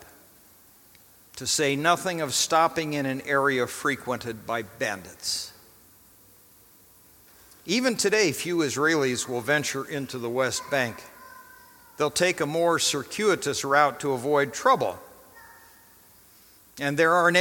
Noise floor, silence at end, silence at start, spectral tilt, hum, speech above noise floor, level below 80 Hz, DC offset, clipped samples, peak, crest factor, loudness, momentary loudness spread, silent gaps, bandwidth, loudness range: -55 dBFS; 0 s; 0 s; -3 dB/octave; none; 30 dB; -66 dBFS; under 0.1%; under 0.1%; -6 dBFS; 22 dB; -25 LUFS; 10 LU; none; 17.5 kHz; 7 LU